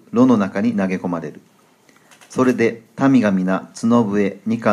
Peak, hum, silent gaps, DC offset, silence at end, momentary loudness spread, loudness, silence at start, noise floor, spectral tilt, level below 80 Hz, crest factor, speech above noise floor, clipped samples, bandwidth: -2 dBFS; none; none; under 0.1%; 0 s; 9 LU; -18 LUFS; 0.15 s; -53 dBFS; -7 dB/octave; -64 dBFS; 16 dB; 36 dB; under 0.1%; 11 kHz